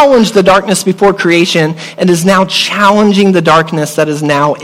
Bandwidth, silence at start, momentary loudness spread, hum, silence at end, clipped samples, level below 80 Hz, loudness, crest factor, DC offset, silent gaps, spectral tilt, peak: 16 kHz; 0 s; 6 LU; none; 0 s; 0.3%; -44 dBFS; -9 LUFS; 8 dB; under 0.1%; none; -4.5 dB/octave; 0 dBFS